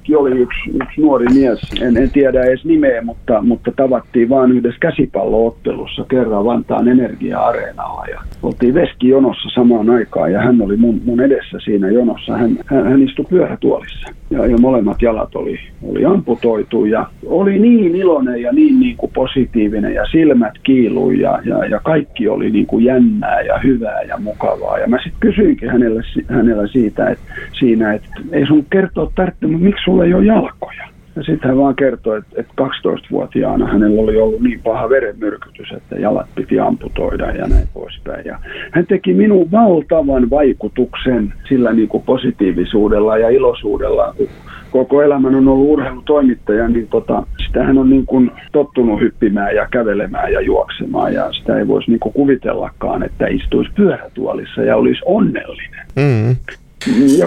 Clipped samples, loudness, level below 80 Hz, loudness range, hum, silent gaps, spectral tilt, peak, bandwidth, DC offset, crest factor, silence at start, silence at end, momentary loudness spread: under 0.1%; -14 LUFS; -30 dBFS; 3 LU; none; none; -8 dB/octave; 0 dBFS; 9.4 kHz; under 0.1%; 12 dB; 0.05 s; 0 s; 10 LU